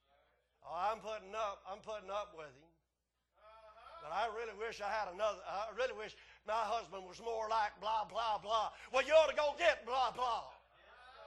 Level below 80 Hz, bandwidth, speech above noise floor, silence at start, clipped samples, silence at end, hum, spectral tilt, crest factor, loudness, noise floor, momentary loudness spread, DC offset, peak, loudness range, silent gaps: -70 dBFS; 11.5 kHz; 49 dB; 0.65 s; under 0.1%; 0 s; none; -2 dB/octave; 22 dB; -38 LUFS; -87 dBFS; 17 LU; under 0.1%; -16 dBFS; 10 LU; none